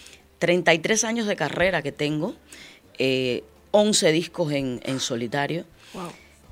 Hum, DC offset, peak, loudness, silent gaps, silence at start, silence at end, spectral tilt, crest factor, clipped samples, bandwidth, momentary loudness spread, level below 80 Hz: none; under 0.1%; -2 dBFS; -23 LUFS; none; 0 s; 0.35 s; -3.5 dB/octave; 22 dB; under 0.1%; 16.5 kHz; 18 LU; -56 dBFS